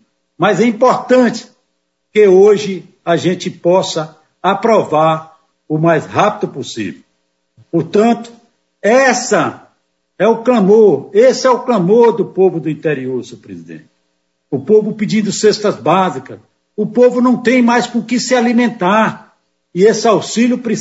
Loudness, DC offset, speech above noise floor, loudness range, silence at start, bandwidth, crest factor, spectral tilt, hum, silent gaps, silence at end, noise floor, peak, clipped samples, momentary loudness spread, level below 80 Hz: -13 LUFS; under 0.1%; 56 dB; 5 LU; 0.4 s; 8 kHz; 14 dB; -5.5 dB/octave; none; none; 0 s; -68 dBFS; 0 dBFS; under 0.1%; 13 LU; -64 dBFS